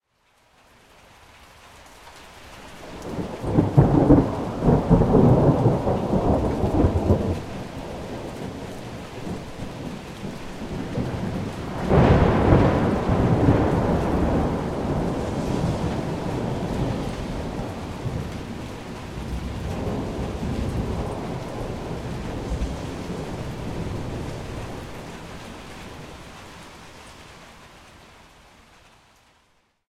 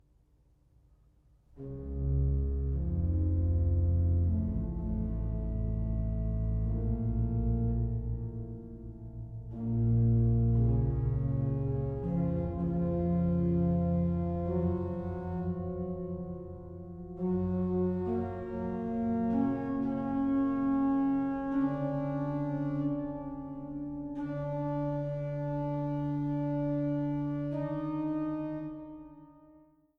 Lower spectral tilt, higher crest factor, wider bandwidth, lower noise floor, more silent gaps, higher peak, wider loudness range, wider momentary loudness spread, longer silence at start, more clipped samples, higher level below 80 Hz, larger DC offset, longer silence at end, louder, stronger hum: second, -8 dB/octave vs -12 dB/octave; first, 22 dB vs 14 dB; first, 14 kHz vs 3.9 kHz; about the same, -64 dBFS vs -66 dBFS; neither; first, -2 dBFS vs -18 dBFS; first, 17 LU vs 5 LU; first, 21 LU vs 12 LU; about the same, 1.65 s vs 1.55 s; neither; first, -34 dBFS vs -40 dBFS; neither; first, 1.9 s vs 0.4 s; first, -24 LUFS vs -32 LUFS; neither